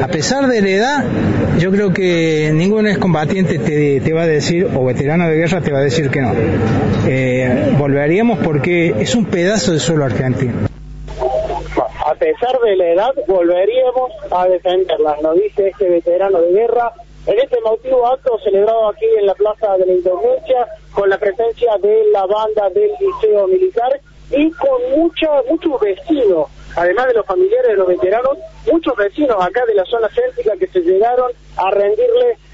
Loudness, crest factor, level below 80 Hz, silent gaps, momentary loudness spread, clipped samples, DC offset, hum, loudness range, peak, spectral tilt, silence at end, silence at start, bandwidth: -14 LUFS; 10 dB; -40 dBFS; none; 5 LU; under 0.1%; under 0.1%; none; 1 LU; -4 dBFS; -5.5 dB/octave; 0.2 s; 0 s; 8 kHz